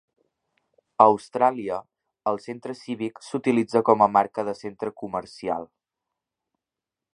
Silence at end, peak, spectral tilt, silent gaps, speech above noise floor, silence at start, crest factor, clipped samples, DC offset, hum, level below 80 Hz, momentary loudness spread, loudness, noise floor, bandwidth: 1.5 s; 0 dBFS; -6.5 dB/octave; none; 65 dB; 1 s; 24 dB; under 0.1%; under 0.1%; none; -68 dBFS; 14 LU; -24 LUFS; -88 dBFS; 10.5 kHz